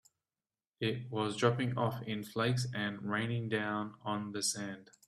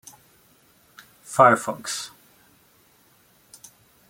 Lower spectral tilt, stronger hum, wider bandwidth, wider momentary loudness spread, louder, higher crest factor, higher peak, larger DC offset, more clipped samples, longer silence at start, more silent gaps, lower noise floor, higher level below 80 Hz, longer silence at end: about the same, -4.5 dB/octave vs -3.5 dB/octave; neither; second, 14 kHz vs 16.5 kHz; second, 7 LU vs 15 LU; second, -35 LUFS vs -20 LUFS; about the same, 20 dB vs 24 dB; second, -16 dBFS vs -2 dBFS; neither; neither; second, 0.8 s vs 1.3 s; neither; first, under -90 dBFS vs -59 dBFS; about the same, -72 dBFS vs -72 dBFS; second, 0.25 s vs 2.05 s